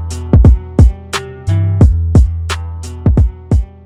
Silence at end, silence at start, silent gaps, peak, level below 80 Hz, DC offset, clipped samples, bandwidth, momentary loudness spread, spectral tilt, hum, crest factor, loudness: 0.15 s; 0 s; none; 0 dBFS; -14 dBFS; under 0.1%; 1%; 11.5 kHz; 12 LU; -7 dB/octave; none; 10 dB; -13 LUFS